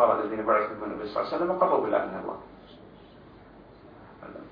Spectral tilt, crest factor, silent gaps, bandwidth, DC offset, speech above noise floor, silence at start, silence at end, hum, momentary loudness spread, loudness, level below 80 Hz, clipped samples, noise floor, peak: -8.5 dB/octave; 22 dB; none; 5.2 kHz; under 0.1%; 23 dB; 0 s; 0 s; none; 24 LU; -27 LUFS; -60 dBFS; under 0.1%; -50 dBFS; -8 dBFS